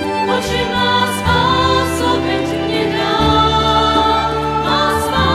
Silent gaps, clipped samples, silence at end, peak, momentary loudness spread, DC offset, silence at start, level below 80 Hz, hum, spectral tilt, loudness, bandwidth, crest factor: none; under 0.1%; 0 s; -2 dBFS; 5 LU; under 0.1%; 0 s; -30 dBFS; none; -4.5 dB/octave; -14 LUFS; 16 kHz; 14 dB